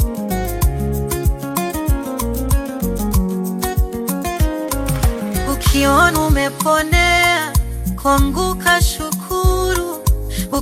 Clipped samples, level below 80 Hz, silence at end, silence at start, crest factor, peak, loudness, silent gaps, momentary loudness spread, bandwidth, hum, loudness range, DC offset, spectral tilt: under 0.1%; -22 dBFS; 0 s; 0 s; 16 dB; 0 dBFS; -17 LUFS; none; 8 LU; 16.5 kHz; none; 5 LU; under 0.1%; -4.5 dB/octave